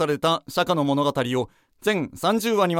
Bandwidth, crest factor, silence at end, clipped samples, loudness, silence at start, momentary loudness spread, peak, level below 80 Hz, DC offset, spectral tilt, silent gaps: 16.5 kHz; 18 dB; 0 s; under 0.1%; -23 LUFS; 0 s; 6 LU; -6 dBFS; -60 dBFS; under 0.1%; -5 dB/octave; none